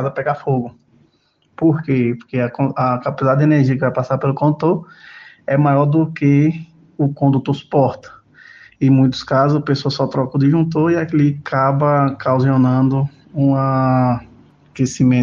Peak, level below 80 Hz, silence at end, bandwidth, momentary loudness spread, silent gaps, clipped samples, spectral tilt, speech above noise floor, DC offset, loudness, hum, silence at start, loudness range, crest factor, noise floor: -2 dBFS; -52 dBFS; 0 s; 7.4 kHz; 7 LU; none; under 0.1%; -8 dB/octave; 44 dB; under 0.1%; -16 LUFS; none; 0 s; 2 LU; 14 dB; -60 dBFS